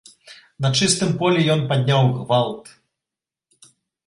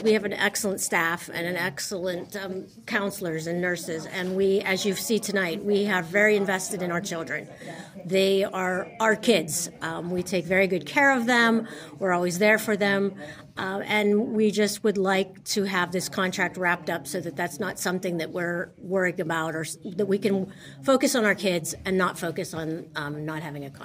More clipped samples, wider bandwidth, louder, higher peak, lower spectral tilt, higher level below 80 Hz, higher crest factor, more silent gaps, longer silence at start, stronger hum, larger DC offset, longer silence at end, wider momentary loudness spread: neither; second, 11.5 kHz vs 16 kHz; first, -19 LUFS vs -25 LUFS; about the same, -4 dBFS vs -6 dBFS; about the same, -5 dB/octave vs -4 dB/octave; first, -56 dBFS vs -64 dBFS; about the same, 18 dB vs 20 dB; neither; first, 0.3 s vs 0 s; neither; neither; first, 1.45 s vs 0 s; second, 7 LU vs 11 LU